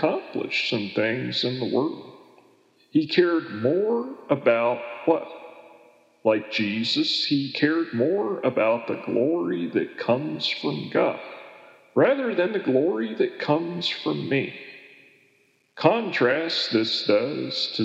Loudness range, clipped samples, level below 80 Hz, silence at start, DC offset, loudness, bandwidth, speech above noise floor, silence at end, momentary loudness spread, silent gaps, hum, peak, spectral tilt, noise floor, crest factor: 2 LU; under 0.1%; -84 dBFS; 0 s; under 0.1%; -24 LUFS; 8.2 kHz; 40 dB; 0 s; 6 LU; none; none; 0 dBFS; -6 dB/octave; -64 dBFS; 24 dB